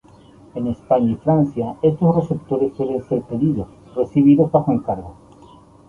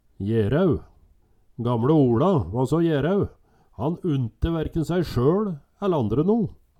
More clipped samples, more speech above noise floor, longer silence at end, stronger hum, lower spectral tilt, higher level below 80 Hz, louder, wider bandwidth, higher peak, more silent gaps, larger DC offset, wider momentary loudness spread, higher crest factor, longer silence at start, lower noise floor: neither; second, 28 dB vs 36 dB; first, 0.75 s vs 0.25 s; neither; first, -11 dB/octave vs -9 dB/octave; second, -48 dBFS vs -42 dBFS; first, -19 LUFS vs -23 LUFS; second, 6.6 kHz vs 14 kHz; first, -2 dBFS vs -8 dBFS; neither; neither; first, 13 LU vs 10 LU; about the same, 16 dB vs 16 dB; first, 0.55 s vs 0.2 s; second, -46 dBFS vs -58 dBFS